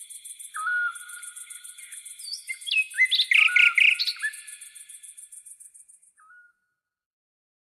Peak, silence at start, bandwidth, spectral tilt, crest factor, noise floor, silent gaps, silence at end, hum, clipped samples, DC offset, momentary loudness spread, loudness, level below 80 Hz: -8 dBFS; 0 s; 14 kHz; 7.5 dB/octave; 20 dB; -80 dBFS; none; 2.2 s; none; under 0.1%; under 0.1%; 26 LU; -20 LUFS; -84 dBFS